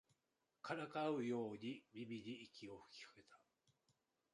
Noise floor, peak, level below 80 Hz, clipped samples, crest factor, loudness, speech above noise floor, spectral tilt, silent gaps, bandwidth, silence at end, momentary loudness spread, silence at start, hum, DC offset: -89 dBFS; -30 dBFS; -88 dBFS; under 0.1%; 20 dB; -48 LUFS; 41 dB; -6 dB/octave; none; 11 kHz; 0.95 s; 15 LU; 0.65 s; none; under 0.1%